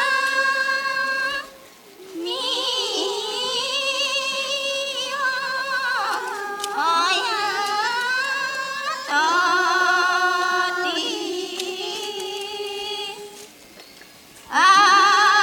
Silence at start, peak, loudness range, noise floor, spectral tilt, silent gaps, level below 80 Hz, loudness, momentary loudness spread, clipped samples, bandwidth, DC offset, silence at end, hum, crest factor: 0 s; -4 dBFS; 5 LU; -46 dBFS; 0 dB/octave; none; -68 dBFS; -20 LUFS; 11 LU; under 0.1%; 18 kHz; under 0.1%; 0 s; none; 18 dB